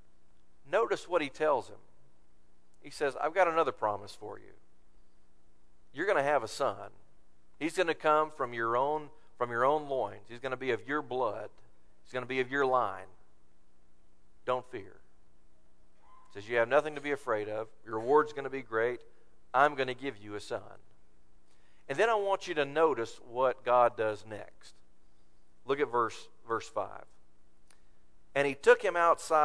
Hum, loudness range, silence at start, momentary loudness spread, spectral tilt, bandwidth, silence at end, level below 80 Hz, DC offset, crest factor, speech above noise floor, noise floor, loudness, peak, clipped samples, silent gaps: none; 5 LU; 0.7 s; 17 LU; -4.5 dB/octave; 11 kHz; 0 s; -68 dBFS; 0.4%; 24 dB; 35 dB; -66 dBFS; -31 LUFS; -10 dBFS; under 0.1%; none